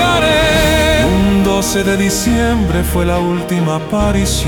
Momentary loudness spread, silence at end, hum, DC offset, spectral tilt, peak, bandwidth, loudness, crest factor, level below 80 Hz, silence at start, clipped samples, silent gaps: 5 LU; 0 s; none; under 0.1%; -4.5 dB/octave; -2 dBFS; 18 kHz; -13 LUFS; 12 dB; -22 dBFS; 0 s; under 0.1%; none